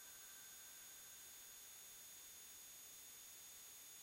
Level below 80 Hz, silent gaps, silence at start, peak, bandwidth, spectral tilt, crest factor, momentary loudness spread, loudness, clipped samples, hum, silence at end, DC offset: -86 dBFS; none; 0 s; -46 dBFS; 16 kHz; 1 dB/octave; 12 dB; 0 LU; -56 LUFS; under 0.1%; none; 0 s; under 0.1%